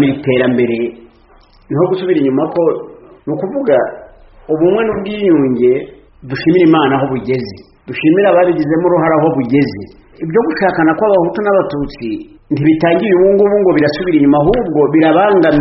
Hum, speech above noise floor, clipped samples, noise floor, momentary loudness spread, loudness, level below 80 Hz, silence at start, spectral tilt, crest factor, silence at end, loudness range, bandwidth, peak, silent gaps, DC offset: none; 34 dB; under 0.1%; -45 dBFS; 12 LU; -12 LUFS; -40 dBFS; 0 s; -6 dB/octave; 12 dB; 0 s; 4 LU; 5.8 kHz; 0 dBFS; none; under 0.1%